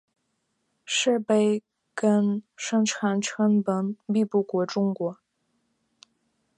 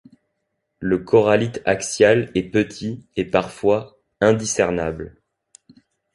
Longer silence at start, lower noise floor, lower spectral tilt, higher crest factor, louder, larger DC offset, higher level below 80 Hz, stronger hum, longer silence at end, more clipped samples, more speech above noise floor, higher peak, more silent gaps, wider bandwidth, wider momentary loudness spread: about the same, 0.85 s vs 0.8 s; about the same, -75 dBFS vs -75 dBFS; about the same, -5 dB/octave vs -5 dB/octave; about the same, 16 dB vs 18 dB; second, -25 LUFS vs -20 LUFS; neither; second, -78 dBFS vs -48 dBFS; neither; first, 1.45 s vs 1.05 s; neither; second, 51 dB vs 56 dB; second, -10 dBFS vs -2 dBFS; neither; about the same, 10.5 kHz vs 11.5 kHz; second, 8 LU vs 12 LU